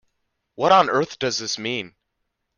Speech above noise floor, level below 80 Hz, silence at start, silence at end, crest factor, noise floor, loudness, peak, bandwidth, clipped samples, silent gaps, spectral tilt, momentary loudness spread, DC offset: 56 dB; -64 dBFS; 0.6 s; 0.7 s; 20 dB; -76 dBFS; -21 LUFS; -4 dBFS; 10 kHz; under 0.1%; none; -3 dB/octave; 12 LU; under 0.1%